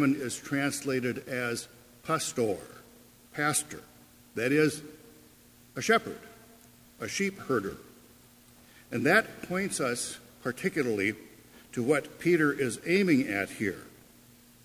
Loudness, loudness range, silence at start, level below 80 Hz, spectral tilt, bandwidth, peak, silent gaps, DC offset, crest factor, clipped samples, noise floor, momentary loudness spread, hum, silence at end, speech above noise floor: -29 LUFS; 5 LU; 0 s; -66 dBFS; -4.5 dB/octave; 16 kHz; -8 dBFS; none; under 0.1%; 22 dB; under 0.1%; -57 dBFS; 17 LU; none; 0.75 s; 28 dB